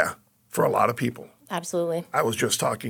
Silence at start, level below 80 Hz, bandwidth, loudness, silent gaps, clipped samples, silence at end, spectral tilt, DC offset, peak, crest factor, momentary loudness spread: 0 s; -68 dBFS; 19.5 kHz; -25 LUFS; none; under 0.1%; 0 s; -4 dB/octave; under 0.1%; -6 dBFS; 20 dB; 11 LU